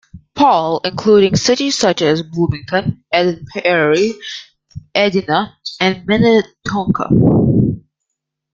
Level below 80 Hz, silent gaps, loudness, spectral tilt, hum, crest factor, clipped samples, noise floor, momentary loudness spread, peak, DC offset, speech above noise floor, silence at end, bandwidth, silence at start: -42 dBFS; none; -14 LUFS; -5.5 dB/octave; none; 14 dB; under 0.1%; -77 dBFS; 9 LU; 0 dBFS; under 0.1%; 63 dB; 0.75 s; 9.2 kHz; 0.15 s